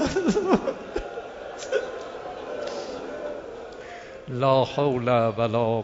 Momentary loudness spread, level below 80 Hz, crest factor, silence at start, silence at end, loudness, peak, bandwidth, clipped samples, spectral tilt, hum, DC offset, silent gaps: 16 LU; -50 dBFS; 20 dB; 0 s; 0 s; -26 LUFS; -6 dBFS; 8 kHz; under 0.1%; -6 dB/octave; none; under 0.1%; none